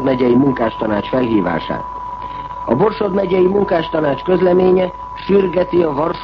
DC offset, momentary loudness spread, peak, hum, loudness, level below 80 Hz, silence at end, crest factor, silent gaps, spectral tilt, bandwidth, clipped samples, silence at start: under 0.1%; 13 LU; -2 dBFS; none; -15 LUFS; -40 dBFS; 0 s; 12 dB; none; -9 dB/octave; 5.8 kHz; under 0.1%; 0 s